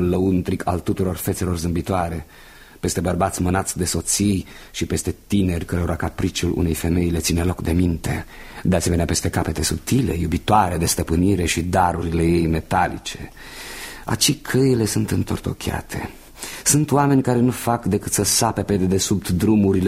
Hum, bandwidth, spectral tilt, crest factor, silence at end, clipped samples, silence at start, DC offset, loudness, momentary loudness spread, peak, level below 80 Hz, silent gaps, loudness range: none; 16 kHz; -5 dB/octave; 18 dB; 0 s; under 0.1%; 0 s; under 0.1%; -20 LUFS; 11 LU; -2 dBFS; -36 dBFS; none; 3 LU